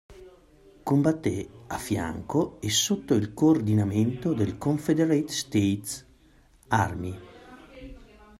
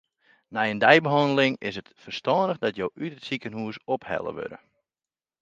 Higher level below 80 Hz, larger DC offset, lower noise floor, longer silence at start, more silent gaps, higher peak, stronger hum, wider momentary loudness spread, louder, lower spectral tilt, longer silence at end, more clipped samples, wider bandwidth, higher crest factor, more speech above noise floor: first, -54 dBFS vs -66 dBFS; neither; second, -58 dBFS vs under -90 dBFS; second, 0.1 s vs 0.5 s; neither; second, -8 dBFS vs 0 dBFS; neither; about the same, 15 LU vs 17 LU; about the same, -26 LUFS vs -25 LUFS; about the same, -5 dB/octave vs -6 dB/octave; second, 0.35 s vs 0.85 s; neither; first, 16 kHz vs 9 kHz; second, 18 dB vs 26 dB; second, 33 dB vs over 65 dB